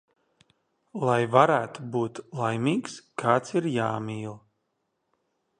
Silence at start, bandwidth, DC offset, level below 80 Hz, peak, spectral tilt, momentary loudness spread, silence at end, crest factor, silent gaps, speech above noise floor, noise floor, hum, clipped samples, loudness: 0.95 s; 10 kHz; under 0.1%; -70 dBFS; -4 dBFS; -6.5 dB/octave; 15 LU; 1.2 s; 24 dB; none; 52 dB; -77 dBFS; none; under 0.1%; -26 LUFS